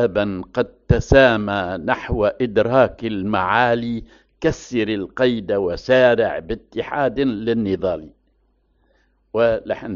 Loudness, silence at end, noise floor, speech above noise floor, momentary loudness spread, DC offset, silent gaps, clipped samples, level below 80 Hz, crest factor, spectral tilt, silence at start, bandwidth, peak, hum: -19 LUFS; 0 s; -62 dBFS; 44 dB; 10 LU; under 0.1%; none; under 0.1%; -38 dBFS; 20 dB; -4.5 dB/octave; 0 s; 7.4 kHz; 0 dBFS; none